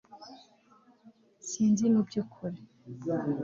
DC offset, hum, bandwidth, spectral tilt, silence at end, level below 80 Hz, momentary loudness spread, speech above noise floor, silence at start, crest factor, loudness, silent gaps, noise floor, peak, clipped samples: under 0.1%; none; 7.6 kHz; -6.5 dB/octave; 0 s; -72 dBFS; 24 LU; 33 dB; 0.1 s; 16 dB; -30 LUFS; none; -62 dBFS; -16 dBFS; under 0.1%